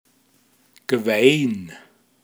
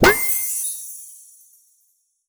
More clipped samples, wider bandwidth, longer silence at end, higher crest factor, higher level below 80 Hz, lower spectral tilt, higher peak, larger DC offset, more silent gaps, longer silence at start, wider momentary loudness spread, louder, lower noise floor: neither; about the same, over 20 kHz vs over 20 kHz; second, 0.45 s vs 1.15 s; about the same, 22 dB vs 22 dB; second, -72 dBFS vs -44 dBFS; first, -5 dB/octave vs -2.5 dB/octave; about the same, 0 dBFS vs 0 dBFS; neither; neither; first, 0.9 s vs 0 s; second, 20 LU vs 23 LU; about the same, -19 LUFS vs -19 LUFS; second, -60 dBFS vs -65 dBFS